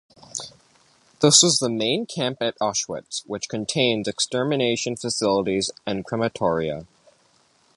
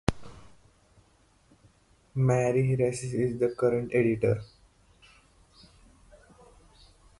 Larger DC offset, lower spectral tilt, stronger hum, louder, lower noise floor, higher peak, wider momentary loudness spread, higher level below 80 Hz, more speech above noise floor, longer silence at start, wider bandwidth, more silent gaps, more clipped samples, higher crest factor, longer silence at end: neither; second, -3 dB/octave vs -7.5 dB/octave; neither; first, -22 LUFS vs -27 LUFS; about the same, -61 dBFS vs -63 dBFS; first, -2 dBFS vs -6 dBFS; first, 15 LU vs 8 LU; second, -58 dBFS vs -52 dBFS; about the same, 38 dB vs 37 dB; first, 0.35 s vs 0.1 s; about the same, 11.5 kHz vs 11.5 kHz; neither; neither; about the same, 22 dB vs 24 dB; second, 0.9 s vs 2.75 s